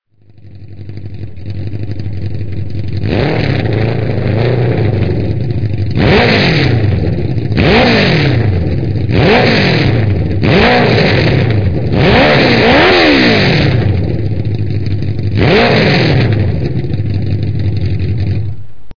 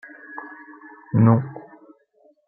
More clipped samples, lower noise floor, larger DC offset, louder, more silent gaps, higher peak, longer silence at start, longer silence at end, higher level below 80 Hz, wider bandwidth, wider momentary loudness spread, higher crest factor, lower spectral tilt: neither; second, -39 dBFS vs -59 dBFS; first, 6% vs under 0.1%; first, -11 LUFS vs -19 LUFS; neither; about the same, 0 dBFS vs -2 dBFS; second, 0 s vs 0.3 s; second, 0 s vs 0.9 s; first, -28 dBFS vs -64 dBFS; first, 5.4 kHz vs 2.7 kHz; second, 13 LU vs 26 LU; second, 12 dB vs 22 dB; second, -7.5 dB/octave vs -14 dB/octave